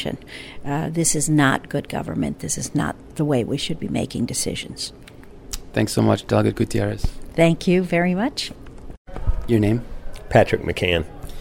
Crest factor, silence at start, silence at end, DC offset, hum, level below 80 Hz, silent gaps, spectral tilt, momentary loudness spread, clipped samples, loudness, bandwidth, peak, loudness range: 20 dB; 0 s; 0 s; under 0.1%; none; -34 dBFS; 8.97-9.05 s; -5 dB/octave; 14 LU; under 0.1%; -22 LUFS; 16.5 kHz; -2 dBFS; 4 LU